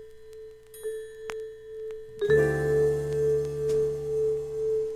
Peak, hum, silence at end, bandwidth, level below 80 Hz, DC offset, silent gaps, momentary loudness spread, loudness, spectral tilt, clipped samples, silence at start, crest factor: -12 dBFS; 60 Hz at -65 dBFS; 0 s; 13.5 kHz; -50 dBFS; under 0.1%; none; 20 LU; -27 LUFS; -6.5 dB/octave; under 0.1%; 0 s; 16 dB